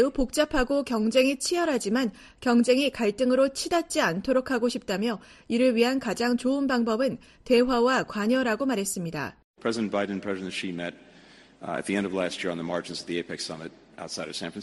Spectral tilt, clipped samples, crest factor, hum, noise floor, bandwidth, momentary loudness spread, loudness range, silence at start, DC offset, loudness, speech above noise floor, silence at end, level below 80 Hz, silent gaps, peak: -4 dB/octave; under 0.1%; 18 dB; none; -53 dBFS; 13 kHz; 12 LU; 7 LU; 0 s; under 0.1%; -26 LUFS; 27 dB; 0 s; -50 dBFS; 9.44-9.54 s; -8 dBFS